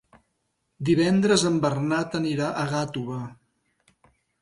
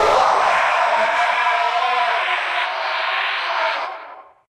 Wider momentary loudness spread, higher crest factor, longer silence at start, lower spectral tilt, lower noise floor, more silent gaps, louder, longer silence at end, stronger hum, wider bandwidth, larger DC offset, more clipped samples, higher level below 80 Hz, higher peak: first, 12 LU vs 6 LU; about the same, 18 dB vs 16 dB; first, 0.8 s vs 0 s; first, -5.5 dB/octave vs -1 dB/octave; first, -75 dBFS vs -39 dBFS; neither; second, -24 LUFS vs -18 LUFS; first, 1.1 s vs 0.25 s; neither; second, 11.5 kHz vs 15.5 kHz; neither; neither; second, -60 dBFS vs -54 dBFS; second, -8 dBFS vs -4 dBFS